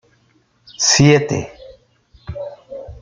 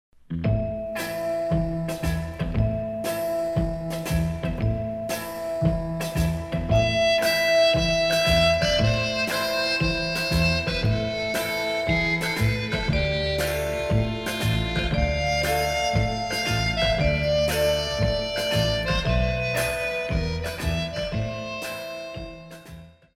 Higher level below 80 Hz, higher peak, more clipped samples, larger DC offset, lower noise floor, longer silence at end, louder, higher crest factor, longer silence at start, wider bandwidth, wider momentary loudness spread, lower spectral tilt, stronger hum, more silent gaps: second, -46 dBFS vs -34 dBFS; first, 0 dBFS vs -8 dBFS; neither; neither; first, -58 dBFS vs -45 dBFS; second, 0.05 s vs 0.25 s; first, -14 LUFS vs -24 LUFS; about the same, 20 dB vs 16 dB; first, 0.8 s vs 0.3 s; second, 9.6 kHz vs 16.5 kHz; first, 23 LU vs 9 LU; about the same, -4 dB/octave vs -5 dB/octave; neither; neither